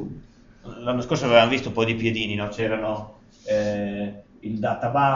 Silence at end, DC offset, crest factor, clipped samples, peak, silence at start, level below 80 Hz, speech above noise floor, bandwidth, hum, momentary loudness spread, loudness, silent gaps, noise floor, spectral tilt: 0 s; under 0.1%; 20 dB; under 0.1%; -2 dBFS; 0 s; -50 dBFS; 24 dB; 7.4 kHz; none; 20 LU; -24 LUFS; none; -47 dBFS; -4 dB/octave